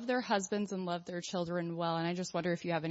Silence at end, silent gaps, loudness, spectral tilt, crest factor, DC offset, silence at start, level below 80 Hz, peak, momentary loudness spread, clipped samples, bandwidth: 0 s; none; -36 LUFS; -4.5 dB/octave; 16 dB; under 0.1%; 0 s; -74 dBFS; -18 dBFS; 5 LU; under 0.1%; 7.6 kHz